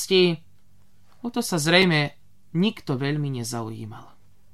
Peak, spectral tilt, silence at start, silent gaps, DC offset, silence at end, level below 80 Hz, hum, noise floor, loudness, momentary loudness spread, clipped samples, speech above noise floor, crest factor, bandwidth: -4 dBFS; -4.5 dB/octave; 0 s; none; 0.5%; 0.5 s; -60 dBFS; none; -60 dBFS; -23 LUFS; 17 LU; under 0.1%; 37 dB; 20 dB; 14.5 kHz